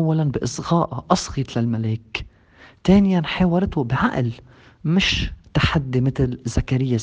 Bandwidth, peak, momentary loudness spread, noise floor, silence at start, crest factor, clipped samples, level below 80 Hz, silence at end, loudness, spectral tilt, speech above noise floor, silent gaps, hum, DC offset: 9.4 kHz; -2 dBFS; 8 LU; -50 dBFS; 0 s; 20 dB; under 0.1%; -36 dBFS; 0 s; -21 LUFS; -6 dB/octave; 30 dB; none; none; under 0.1%